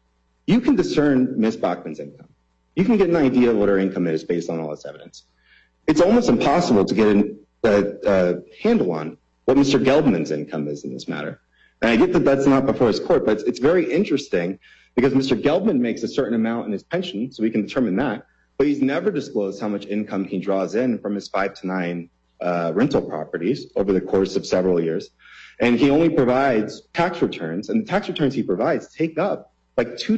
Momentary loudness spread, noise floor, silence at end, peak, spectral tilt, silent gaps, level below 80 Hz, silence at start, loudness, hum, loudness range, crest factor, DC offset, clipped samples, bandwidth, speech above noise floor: 11 LU; -57 dBFS; 0 s; -6 dBFS; -6.5 dB/octave; none; -50 dBFS; 0.5 s; -21 LUFS; none; 4 LU; 14 dB; under 0.1%; under 0.1%; 8.2 kHz; 37 dB